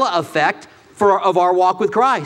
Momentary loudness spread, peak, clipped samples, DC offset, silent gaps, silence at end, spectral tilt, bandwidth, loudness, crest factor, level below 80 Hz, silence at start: 4 LU; -2 dBFS; under 0.1%; under 0.1%; none; 0 s; -5 dB/octave; 13.5 kHz; -16 LUFS; 14 dB; -60 dBFS; 0 s